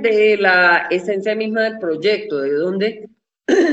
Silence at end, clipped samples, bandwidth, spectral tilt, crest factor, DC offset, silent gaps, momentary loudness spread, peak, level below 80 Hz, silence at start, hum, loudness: 0 s; under 0.1%; 8 kHz; -5 dB/octave; 16 dB; under 0.1%; none; 9 LU; 0 dBFS; -66 dBFS; 0 s; none; -17 LUFS